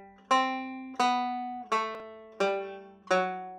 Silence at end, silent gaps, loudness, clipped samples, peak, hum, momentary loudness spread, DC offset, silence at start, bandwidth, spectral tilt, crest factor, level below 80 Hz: 0 s; none; -30 LUFS; under 0.1%; -12 dBFS; none; 15 LU; under 0.1%; 0 s; 12 kHz; -3.5 dB/octave; 18 dB; -78 dBFS